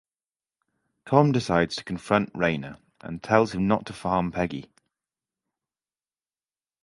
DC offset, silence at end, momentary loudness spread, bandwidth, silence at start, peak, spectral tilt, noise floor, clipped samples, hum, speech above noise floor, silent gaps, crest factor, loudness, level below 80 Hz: under 0.1%; 2.2 s; 16 LU; 11.5 kHz; 1.05 s; -4 dBFS; -6.5 dB/octave; under -90 dBFS; under 0.1%; none; over 66 dB; none; 24 dB; -25 LUFS; -54 dBFS